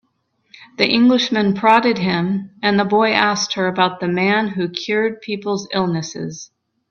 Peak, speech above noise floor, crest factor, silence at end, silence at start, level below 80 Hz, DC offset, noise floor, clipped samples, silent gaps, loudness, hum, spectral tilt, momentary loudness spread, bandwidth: 0 dBFS; 48 dB; 18 dB; 0.45 s; 0.6 s; -58 dBFS; under 0.1%; -65 dBFS; under 0.1%; none; -17 LUFS; none; -5 dB/octave; 11 LU; 7.2 kHz